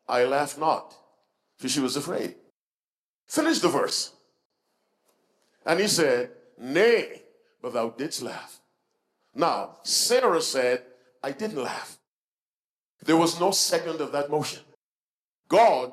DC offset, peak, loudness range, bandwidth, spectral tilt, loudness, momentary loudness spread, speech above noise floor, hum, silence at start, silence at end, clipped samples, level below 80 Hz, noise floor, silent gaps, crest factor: under 0.1%; -10 dBFS; 3 LU; 15 kHz; -3 dB/octave; -25 LUFS; 16 LU; over 65 dB; none; 0.1 s; 0 s; under 0.1%; -78 dBFS; under -90 dBFS; 2.50-3.27 s, 4.45-4.50 s, 12.07-12.98 s, 14.75-15.44 s; 18 dB